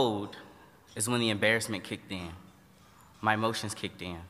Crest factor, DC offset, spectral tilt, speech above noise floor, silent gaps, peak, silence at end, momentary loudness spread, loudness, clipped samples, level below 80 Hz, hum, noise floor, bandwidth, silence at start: 24 dB; under 0.1%; -3.5 dB/octave; 27 dB; none; -10 dBFS; 0 s; 18 LU; -31 LUFS; under 0.1%; -64 dBFS; none; -58 dBFS; 15.5 kHz; 0 s